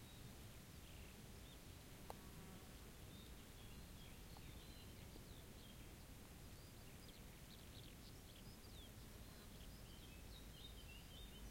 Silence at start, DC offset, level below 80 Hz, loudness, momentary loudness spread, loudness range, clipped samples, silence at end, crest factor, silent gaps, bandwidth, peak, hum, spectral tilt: 0 s; under 0.1%; -64 dBFS; -59 LUFS; 2 LU; 1 LU; under 0.1%; 0 s; 24 dB; none; 16.5 kHz; -34 dBFS; none; -4 dB/octave